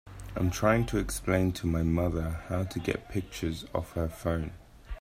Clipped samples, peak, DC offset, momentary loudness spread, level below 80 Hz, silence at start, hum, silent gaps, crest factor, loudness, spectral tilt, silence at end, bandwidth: under 0.1%; -10 dBFS; under 0.1%; 8 LU; -42 dBFS; 0.05 s; none; none; 20 dB; -31 LUFS; -6 dB/octave; 0 s; 16 kHz